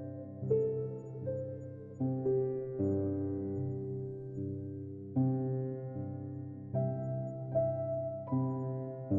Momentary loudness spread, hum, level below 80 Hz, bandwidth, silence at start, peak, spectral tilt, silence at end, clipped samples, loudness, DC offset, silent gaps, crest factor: 10 LU; none; -68 dBFS; 2.2 kHz; 0 s; -20 dBFS; -14 dB/octave; 0 s; under 0.1%; -36 LUFS; under 0.1%; none; 16 dB